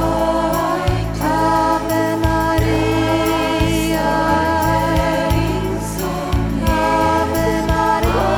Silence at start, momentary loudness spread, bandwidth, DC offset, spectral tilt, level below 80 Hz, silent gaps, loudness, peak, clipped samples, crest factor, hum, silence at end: 0 s; 4 LU; over 20 kHz; under 0.1%; -6 dB/octave; -26 dBFS; none; -17 LUFS; -4 dBFS; under 0.1%; 12 dB; none; 0 s